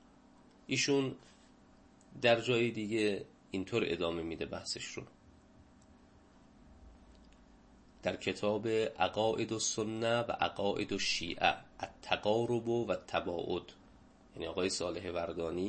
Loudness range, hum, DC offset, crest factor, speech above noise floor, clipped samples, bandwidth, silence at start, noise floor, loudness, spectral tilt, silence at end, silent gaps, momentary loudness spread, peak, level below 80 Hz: 10 LU; none; under 0.1%; 24 dB; 27 dB; under 0.1%; 8.4 kHz; 0.7 s; -62 dBFS; -35 LUFS; -4 dB/octave; 0 s; none; 11 LU; -12 dBFS; -64 dBFS